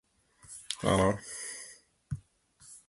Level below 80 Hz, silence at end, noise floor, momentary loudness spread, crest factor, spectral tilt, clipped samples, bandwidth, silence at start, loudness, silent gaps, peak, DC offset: -54 dBFS; 0.1 s; -61 dBFS; 22 LU; 24 dB; -4.5 dB/octave; under 0.1%; 12 kHz; 0.5 s; -32 LUFS; none; -12 dBFS; under 0.1%